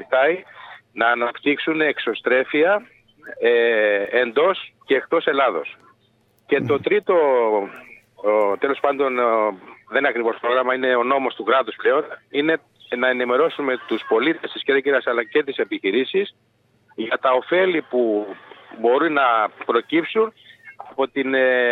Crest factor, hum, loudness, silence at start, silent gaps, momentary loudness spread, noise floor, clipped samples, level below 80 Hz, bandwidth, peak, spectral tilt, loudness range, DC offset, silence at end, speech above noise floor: 18 dB; none; -20 LUFS; 0 s; none; 9 LU; -61 dBFS; under 0.1%; -72 dBFS; 4.5 kHz; -2 dBFS; -7 dB/octave; 2 LU; under 0.1%; 0 s; 41 dB